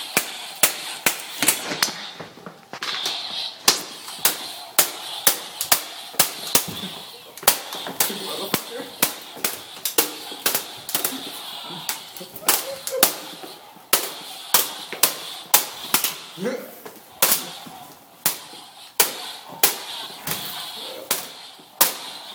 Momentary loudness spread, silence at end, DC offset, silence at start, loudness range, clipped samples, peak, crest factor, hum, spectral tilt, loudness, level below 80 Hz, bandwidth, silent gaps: 16 LU; 0 s; under 0.1%; 0 s; 3 LU; under 0.1%; 0 dBFS; 26 dB; none; 0 dB/octave; -22 LUFS; -64 dBFS; 19.5 kHz; none